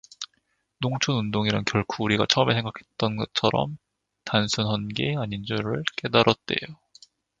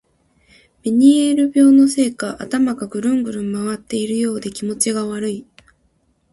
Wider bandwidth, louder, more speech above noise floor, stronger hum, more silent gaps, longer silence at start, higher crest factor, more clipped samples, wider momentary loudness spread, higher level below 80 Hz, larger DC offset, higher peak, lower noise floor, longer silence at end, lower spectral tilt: second, 7.8 kHz vs 11.5 kHz; second, -25 LUFS vs -17 LUFS; about the same, 47 dB vs 46 dB; neither; neither; second, 0.2 s vs 0.85 s; first, 26 dB vs 16 dB; neither; about the same, 14 LU vs 13 LU; about the same, -54 dBFS vs -58 dBFS; neither; about the same, 0 dBFS vs -2 dBFS; first, -72 dBFS vs -62 dBFS; second, 0.65 s vs 0.9 s; about the same, -5 dB/octave vs -4.5 dB/octave